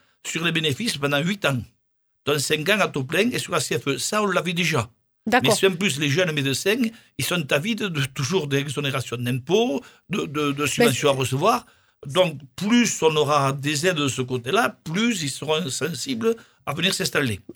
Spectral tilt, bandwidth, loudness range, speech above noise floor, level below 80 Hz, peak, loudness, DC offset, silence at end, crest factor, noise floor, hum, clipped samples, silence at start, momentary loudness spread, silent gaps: -4 dB/octave; over 20 kHz; 2 LU; 47 dB; -60 dBFS; -2 dBFS; -22 LUFS; under 0.1%; 0.05 s; 20 dB; -70 dBFS; none; under 0.1%; 0.25 s; 7 LU; none